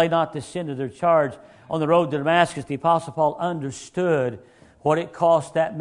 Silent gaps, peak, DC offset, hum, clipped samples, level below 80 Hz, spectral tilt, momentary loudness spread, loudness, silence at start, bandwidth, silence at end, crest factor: none; -2 dBFS; under 0.1%; none; under 0.1%; -60 dBFS; -6 dB/octave; 10 LU; -22 LUFS; 0 s; 11 kHz; 0 s; 20 dB